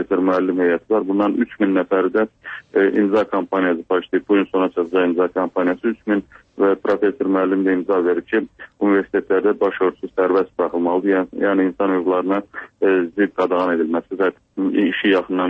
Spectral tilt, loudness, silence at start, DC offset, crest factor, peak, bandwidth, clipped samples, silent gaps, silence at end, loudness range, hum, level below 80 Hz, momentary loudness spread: -8 dB/octave; -19 LUFS; 0 s; under 0.1%; 12 dB; -6 dBFS; 5.2 kHz; under 0.1%; none; 0 s; 1 LU; none; -60 dBFS; 5 LU